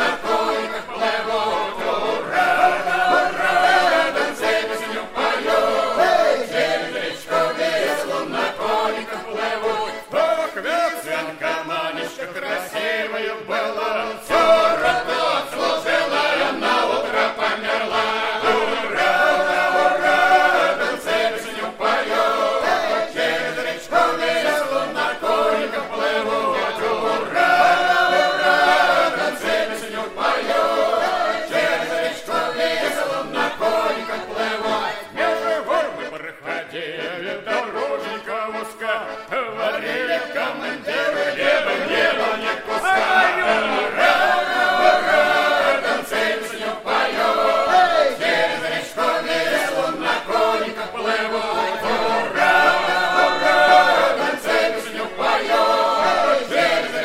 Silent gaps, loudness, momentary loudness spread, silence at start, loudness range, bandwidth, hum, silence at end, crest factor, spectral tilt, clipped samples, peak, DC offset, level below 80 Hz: none; -19 LUFS; 10 LU; 0 s; 6 LU; 16 kHz; none; 0 s; 18 dB; -2.5 dB/octave; under 0.1%; -2 dBFS; under 0.1%; -56 dBFS